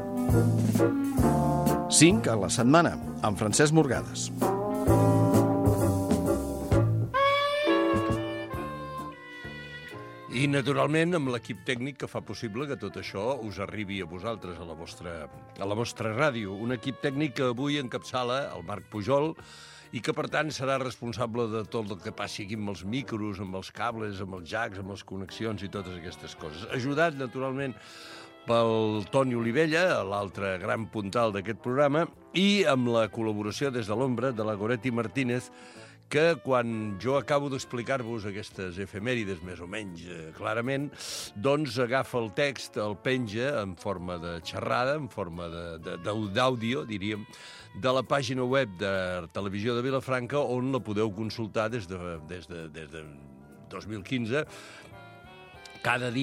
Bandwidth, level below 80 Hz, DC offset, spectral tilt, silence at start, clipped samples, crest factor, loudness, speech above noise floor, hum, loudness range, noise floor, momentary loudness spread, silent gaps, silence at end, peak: 16 kHz; -50 dBFS; under 0.1%; -5 dB/octave; 0 s; under 0.1%; 22 dB; -29 LUFS; 20 dB; none; 10 LU; -49 dBFS; 16 LU; none; 0 s; -6 dBFS